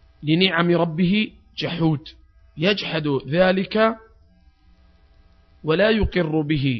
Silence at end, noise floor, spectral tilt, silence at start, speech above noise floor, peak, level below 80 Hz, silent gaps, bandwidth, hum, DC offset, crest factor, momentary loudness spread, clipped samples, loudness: 0 s; -54 dBFS; -8 dB/octave; 0.2 s; 34 dB; 0 dBFS; -40 dBFS; none; 6.2 kHz; none; under 0.1%; 22 dB; 10 LU; under 0.1%; -21 LUFS